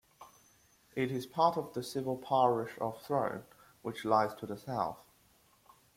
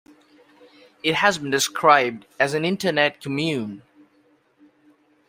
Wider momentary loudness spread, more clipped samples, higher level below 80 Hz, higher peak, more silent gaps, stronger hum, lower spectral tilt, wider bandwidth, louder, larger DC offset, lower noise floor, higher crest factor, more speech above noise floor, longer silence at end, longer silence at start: first, 14 LU vs 11 LU; neither; second, -72 dBFS vs -66 dBFS; second, -14 dBFS vs -2 dBFS; neither; neither; first, -6 dB/octave vs -3.5 dB/octave; about the same, 16.5 kHz vs 16 kHz; second, -34 LUFS vs -21 LUFS; neither; first, -67 dBFS vs -61 dBFS; about the same, 20 dB vs 22 dB; second, 34 dB vs 40 dB; second, 0.95 s vs 1.5 s; second, 0.2 s vs 1.05 s